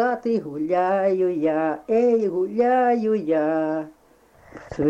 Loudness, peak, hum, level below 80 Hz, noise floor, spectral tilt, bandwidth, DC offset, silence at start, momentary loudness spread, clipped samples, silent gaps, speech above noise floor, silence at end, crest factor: -22 LUFS; -10 dBFS; none; -58 dBFS; -54 dBFS; -8 dB/octave; 8 kHz; under 0.1%; 0 s; 7 LU; under 0.1%; none; 33 dB; 0 s; 12 dB